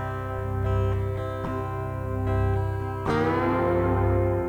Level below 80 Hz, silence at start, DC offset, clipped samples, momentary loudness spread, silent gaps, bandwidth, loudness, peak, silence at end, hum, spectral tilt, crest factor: -36 dBFS; 0 s; under 0.1%; under 0.1%; 7 LU; none; 8.4 kHz; -26 LUFS; -12 dBFS; 0 s; 50 Hz at -50 dBFS; -9 dB/octave; 14 dB